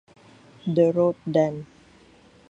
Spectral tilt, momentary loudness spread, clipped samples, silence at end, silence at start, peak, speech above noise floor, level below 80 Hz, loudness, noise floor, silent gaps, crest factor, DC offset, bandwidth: -8.5 dB/octave; 13 LU; under 0.1%; 0.85 s; 0.65 s; -8 dBFS; 32 dB; -64 dBFS; -23 LUFS; -54 dBFS; none; 18 dB; under 0.1%; 7.8 kHz